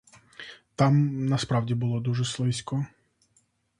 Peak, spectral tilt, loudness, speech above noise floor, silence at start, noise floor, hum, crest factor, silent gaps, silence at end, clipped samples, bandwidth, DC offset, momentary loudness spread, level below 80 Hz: -8 dBFS; -6.5 dB/octave; -26 LUFS; 43 dB; 0.4 s; -68 dBFS; none; 20 dB; none; 0.95 s; under 0.1%; 11 kHz; under 0.1%; 20 LU; -60 dBFS